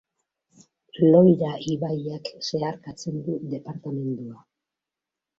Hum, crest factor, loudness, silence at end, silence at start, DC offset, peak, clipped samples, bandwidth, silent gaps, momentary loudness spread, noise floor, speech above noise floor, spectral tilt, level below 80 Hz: none; 20 dB; -24 LUFS; 1.05 s; 0.95 s; under 0.1%; -4 dBFS; under 0.1%; 7.8 kHz; none; 18 LU; -88 dBFS; 64 dB; -7.5 dB/octave; -66 dBFS